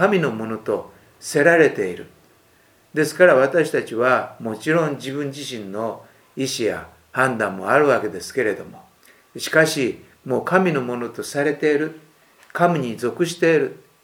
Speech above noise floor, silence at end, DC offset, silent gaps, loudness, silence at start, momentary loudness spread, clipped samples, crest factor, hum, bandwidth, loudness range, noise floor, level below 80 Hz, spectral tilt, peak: 36 dB; 0.3 s; under 0.1%; none; -20 LUFS; 0 s; 14 LU; under 0.1%; 20 dB; none; 19.5 kHz; 4 LU; -56 dBFS; -66 dBFS; -5 dB/octave; 0 dBFS